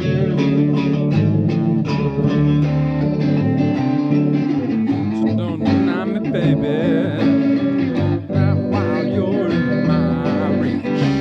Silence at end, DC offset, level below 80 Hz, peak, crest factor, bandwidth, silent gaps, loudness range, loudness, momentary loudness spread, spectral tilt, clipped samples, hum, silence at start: 0 s; under 0.1%; -44 dBFS; -4 dBFS; 14 dB; 6.4 kHz; none; 1 LU; -18 LUFS; 3 LU; -9 dB/octave; under 0.1%; none; 0 s